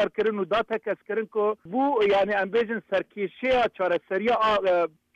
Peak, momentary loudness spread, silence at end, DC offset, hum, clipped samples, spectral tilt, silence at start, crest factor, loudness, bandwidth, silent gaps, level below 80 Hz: -14 dBFS; 7 LU; 0.3 s; under 0.1%; none; under 0.1%; -6 dB/octave; 0 s; 10 dB; -25 LUFS; 8 kHz; none; -58 dBFS